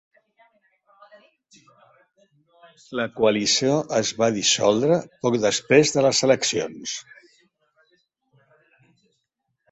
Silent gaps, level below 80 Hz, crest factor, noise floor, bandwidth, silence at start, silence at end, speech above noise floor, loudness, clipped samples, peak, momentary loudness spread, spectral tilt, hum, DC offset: none; -64 dBFS; 22 dB; -77 dBFS; 8.4 kHz; 2.9 s; 2.7 s; 56 dB; -21 LUFS; under 0.1%; -2 dBFS; 12 LU; -3.5 dB/octave; none; under 0.1%